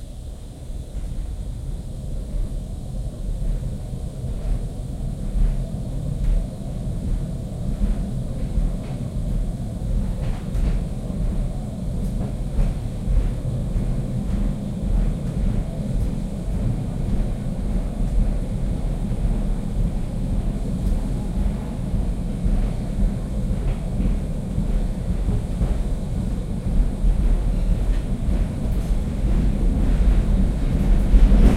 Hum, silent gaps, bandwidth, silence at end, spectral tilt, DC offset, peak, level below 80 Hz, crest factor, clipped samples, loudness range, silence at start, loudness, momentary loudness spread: none; none; 11 kHz; 0 s; -8 dB/octave; under 0.1%; -2 dBFS; -22 dBFS; 18 dB; under 0.1%; 5 LU; 0 s; -26 LUFS; 8 LU